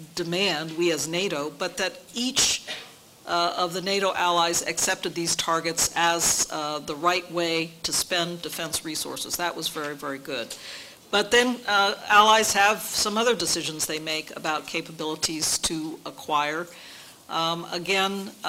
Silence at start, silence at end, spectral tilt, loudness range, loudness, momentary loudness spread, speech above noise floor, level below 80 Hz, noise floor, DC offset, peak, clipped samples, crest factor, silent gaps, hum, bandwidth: 0 s; 0 s; -1.5 dB/octave; 6 LU; -24 LUFS; 12 LU; 20 dB; -58 dBFS; -45 dBFS; under 0.1%; -6 dBFS; under 0.1%; 20 dB; none; none; 16 kHz